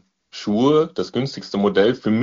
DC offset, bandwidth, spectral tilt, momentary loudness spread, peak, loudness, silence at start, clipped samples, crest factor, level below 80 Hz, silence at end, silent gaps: under 0.1%; 7.4 kHz; -5 dB/octave; 9 LU; -4 dBFS; -19 LUFS; 0.35 s; under 0.1%; 16 dB; -56 dBFS; 0 s; none